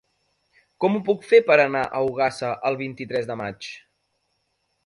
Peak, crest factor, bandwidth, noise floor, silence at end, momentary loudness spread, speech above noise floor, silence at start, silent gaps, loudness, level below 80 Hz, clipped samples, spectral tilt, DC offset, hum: -4 dBFS; 20 dB; 11 kHz; -73 dBFS; 1.05 s; 15 LU; 51 dB; 0.8 s; none; -22 LUFS; -64 dBFS; under 0.1%; -5.5 dB/octave; under 0.1%; none